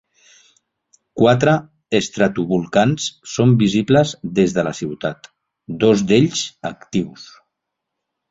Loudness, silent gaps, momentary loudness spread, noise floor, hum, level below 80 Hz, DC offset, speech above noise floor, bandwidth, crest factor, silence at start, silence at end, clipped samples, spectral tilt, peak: -18 LUFS; none; 12 LU; -79 dBFS; none; -52 dBFS; under 0.1%; 62 dB; 8 kHz; 18 dB; 1.15 s; 1.05 s; under 0.1%; -5.5 dB/octave; -2 dBFS